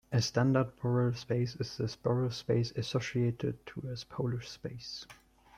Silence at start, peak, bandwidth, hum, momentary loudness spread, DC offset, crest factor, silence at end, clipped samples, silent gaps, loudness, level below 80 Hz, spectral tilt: 0.1 s; -16 dBFS; 10.5 kHz; none; 13 LU; under 0.1%; 18 dB; 0.45 s; under 0.1%; none; -34 LUFS; -62 dBFS; -6.5 dB/octave